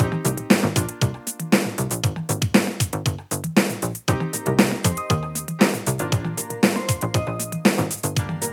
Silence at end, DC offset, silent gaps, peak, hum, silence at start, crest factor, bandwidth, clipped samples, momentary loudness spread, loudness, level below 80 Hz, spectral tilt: 0 s; under 0.1%; none; 0 dBFS; none; 0 s; 22 dB; 19 kHz; under 0.1%; 5 LU; -22 LUFS; -48 dBFS; -5 dB/octave